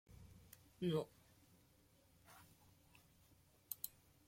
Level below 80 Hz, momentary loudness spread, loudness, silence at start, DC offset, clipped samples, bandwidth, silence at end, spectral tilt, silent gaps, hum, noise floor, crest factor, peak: -76 dBFS; 27 LU; -46 LUFS; 0.1 s; under 0.1%; under 0.1%; 16.5 kHz; 0.4 s; -5.5 dB/octave; none; none; -73 dBFS; 28 dB; -24 dBFS